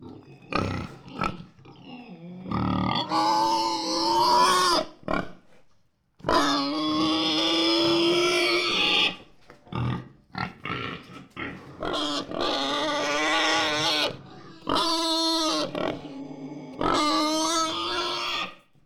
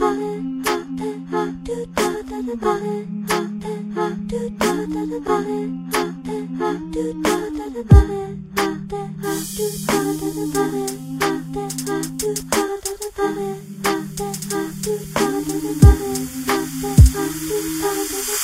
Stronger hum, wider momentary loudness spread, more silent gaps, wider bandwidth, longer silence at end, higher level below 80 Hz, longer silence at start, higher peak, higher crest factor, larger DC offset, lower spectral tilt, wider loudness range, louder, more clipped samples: neither; first, 18 LU vs 13 LU; neither; about the same, 17.5 kHz vs 16 kHz; first, 0.3 s vs 0 s; second, -52 dBFS vs -26 dBFS; about the same, 0 s vs 0 s; second, -10 dBFS vs 0 dBFS; about the same, 16 dB vs 20 dB; neither; second, -3.5 dB/octave vs -5.5 dB/octave; about the same, 7 LU vs 6 LU; second, -24 LUFS vs -21 LUFS; neither